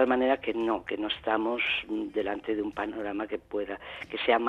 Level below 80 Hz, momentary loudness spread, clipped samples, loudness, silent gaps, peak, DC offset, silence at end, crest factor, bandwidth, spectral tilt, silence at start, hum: -60 dBFS; 8 LU; under 0.1%; -30 LUFS; none; -10 dBFS; under 0.1%; 0 s; 20 dB; 6.8 kHz; -5.5 dB/octave; 0 s; none